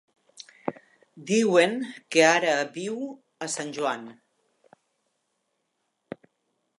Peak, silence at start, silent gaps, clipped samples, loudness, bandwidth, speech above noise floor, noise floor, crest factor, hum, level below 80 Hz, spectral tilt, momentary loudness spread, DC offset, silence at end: -6 dBFS; 0.4 s; none; under 0.1%; -25 LUFS; 11.5 kHz; 53 dB; -77 dBFS; 22 dB; none; -82 dBFS; -3.5 dB/octave; 24 LU; under 0.1%; 2.65 s